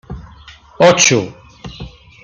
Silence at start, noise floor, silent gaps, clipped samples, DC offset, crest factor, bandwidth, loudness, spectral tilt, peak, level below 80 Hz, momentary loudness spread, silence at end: 0.1 s; -40 dBFS; none; under 0.1%; under 0.1%; 16 dB; 10.5 kHz; -11 LUFS; -3 dB/octave; 0 dBFS; -40 dBFS; 26 LU; 0.35 s